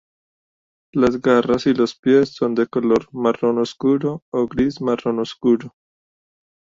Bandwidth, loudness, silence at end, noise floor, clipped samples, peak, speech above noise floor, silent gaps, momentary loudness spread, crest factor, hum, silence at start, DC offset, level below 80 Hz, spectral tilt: 7.6 kHz; -19 LUFS; 1 s; under -90 dBFS; under 0.1%; -2 dBFS; over 72 dB; 1.99-2.03 s, 4.22-4.32 s; 6 LU; 16 dB; none; 0.95 s; under 0.1%; -54 dBFS; -6.5 dB/octave